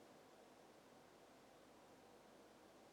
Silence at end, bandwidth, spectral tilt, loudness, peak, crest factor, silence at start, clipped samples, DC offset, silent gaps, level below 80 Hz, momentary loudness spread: 0 s; 17 kHz; -3.5 dB/octave; -66 LUFS; -54 dBFS; 12 dB; 0 s; under 0.1%; under 0.1%; none; -90 dBFS; 1 LU